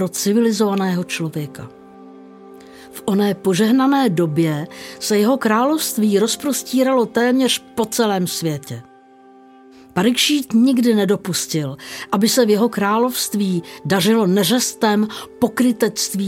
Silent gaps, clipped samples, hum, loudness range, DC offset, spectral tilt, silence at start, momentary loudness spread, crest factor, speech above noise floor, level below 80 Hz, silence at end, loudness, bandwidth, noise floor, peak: none; under 0.1%; none; 3 LU; under 0.1%; -4.5 dB/octave; 0 s; 11 LU; 16 dB; 29 dB; -62 dBFS; 0 s; -17 LUFS; 17 kHz; -46 dBFS; -2 dBFS